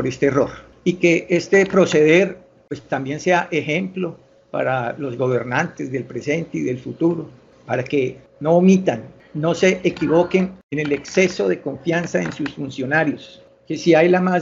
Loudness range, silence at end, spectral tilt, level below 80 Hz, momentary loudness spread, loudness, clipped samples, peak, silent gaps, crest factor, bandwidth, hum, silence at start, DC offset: 5 LU; 0 s; -6 dB/octave; -56 dBFS; 12 LU; -19 LUFS; under 0.1%; -2 dBFS; 10.63-10.69 s; 18 dB; 7.6 kHz; none; 0 s; under 0.1%